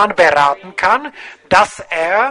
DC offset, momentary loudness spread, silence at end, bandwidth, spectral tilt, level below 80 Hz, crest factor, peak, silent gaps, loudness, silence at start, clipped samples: under 0.1%; 9 LU; 0 s; 11 kHz; -3 dB/octave; -48 dBFS; 14 dB; 0 dBFS; none; -14 LUFS; 0 s; under 0.1%